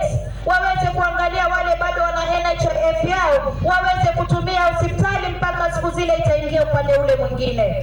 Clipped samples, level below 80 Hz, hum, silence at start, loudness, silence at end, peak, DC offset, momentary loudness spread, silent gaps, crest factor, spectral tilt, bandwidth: under 0.1%; -30 dBFS; none; 0 s; -18 LUFS; 0 s; -8 dBFS; under 0.1%; 4 LU; none; 10 dB; -6 dB/octave; 17 kHz